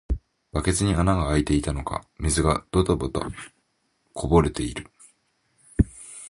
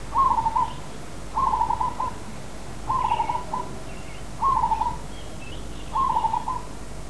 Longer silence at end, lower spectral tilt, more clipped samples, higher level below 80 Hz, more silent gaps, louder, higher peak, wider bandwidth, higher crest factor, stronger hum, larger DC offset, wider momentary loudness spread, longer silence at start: about the same, 0 s vs 0 s; about the same, -5.5 dB/octave vs -4.5 dB/octave; neither; first, -34 dBFS vs -40 dBFS; neither; about the same, -25 LUFS vs -25 LUFS; first, -4 dBFS vs -10 dBFS; about the same, 11.5 kHz vs 11 kHz; first, 22 dB vs 16 dB; neither; second, under 0.1% vs 2%; about the same, 14 LU vs 16 LU; about the same, 0.1 s vs 0 s